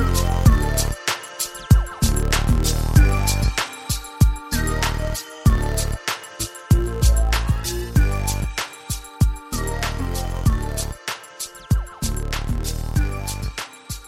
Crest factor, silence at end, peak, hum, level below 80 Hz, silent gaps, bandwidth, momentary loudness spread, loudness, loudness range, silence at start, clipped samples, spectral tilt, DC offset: 18 dB; 0 s; -2 dBFS; none; -22 dBFS; none; 16.5 kHz; 10 LU; -22 LUFS; 5 LU; 0 s; under 0.1%; -4.5 dB/octave; under 0.1%